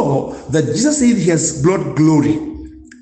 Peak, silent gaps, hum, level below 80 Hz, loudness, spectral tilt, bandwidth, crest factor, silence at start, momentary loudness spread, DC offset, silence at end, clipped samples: -2 dBFS; none; none; -42 dBFS; -15 LUFS; -5.5 dB/octave; 9 kHz; 12 dB; 0 s; 8 LU; under 0.1%; 0.2 s; under 0.1%